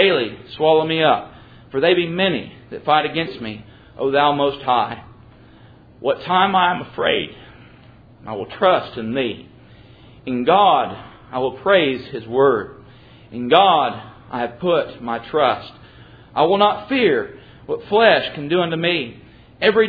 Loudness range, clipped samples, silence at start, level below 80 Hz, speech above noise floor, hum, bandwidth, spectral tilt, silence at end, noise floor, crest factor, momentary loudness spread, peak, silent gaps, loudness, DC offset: 3 LU; under 0.1%; 0 s; -54 dBFS; 28 dB; none; 5 kHz; -8 dB/octave; 0 s; -46 dBFS; 20 dB; 16 LU; 0 dBFS; none; -18 LUFS; under 0.1%